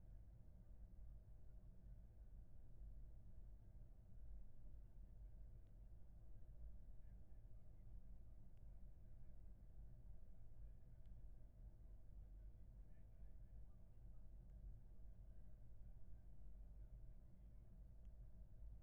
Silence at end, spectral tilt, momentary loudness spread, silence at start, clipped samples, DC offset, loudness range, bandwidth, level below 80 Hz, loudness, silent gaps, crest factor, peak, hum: 0 s; -10.5 dB/octave; 3 LU; 0 s; under 0.1%; under 0.1%; 1 LU; 2.3 kHz; -62 dBFS; -66 LUFS; none; 12 dB; -46 dBFS; none